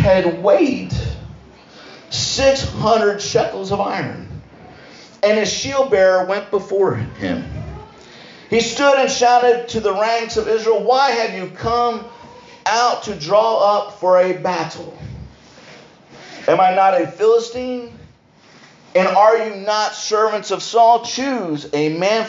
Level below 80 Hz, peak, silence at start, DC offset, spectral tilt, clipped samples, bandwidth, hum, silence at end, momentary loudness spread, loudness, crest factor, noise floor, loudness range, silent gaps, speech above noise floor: -42 dBFS; -2 dBFS; 0 s; under 0.1%; -4 dB/octave; under 0.1%; 7.8 kHz; none; 0 s; 15 LU; -17 LUFS; 16 dB; -48 dBFS; 3 LU; none; 32 dB